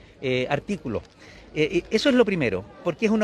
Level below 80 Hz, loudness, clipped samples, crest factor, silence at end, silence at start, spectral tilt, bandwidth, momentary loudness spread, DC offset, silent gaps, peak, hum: -52 dBFS; -24 LUFS; under 0.1%; 18 dB; 0 s; 0.2 s; -6 dB/octave; 12 kHz; 11 LU; under 0.1%; none; -6 dBFS; none